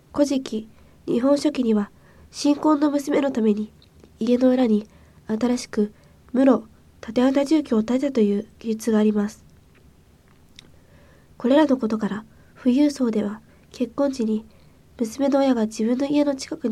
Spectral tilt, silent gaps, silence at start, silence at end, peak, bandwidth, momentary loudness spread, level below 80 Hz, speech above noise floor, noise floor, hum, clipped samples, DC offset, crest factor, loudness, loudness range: -6 dB/octave; none; 0.15 s; 0 s; -4 dBFS; 13 kHz; 11 LU; -56 dBFS; 33 dB; -53 dBFS; none; under 0.1%; under 0.1%; 18 dB; -22 LUFS; 3 LU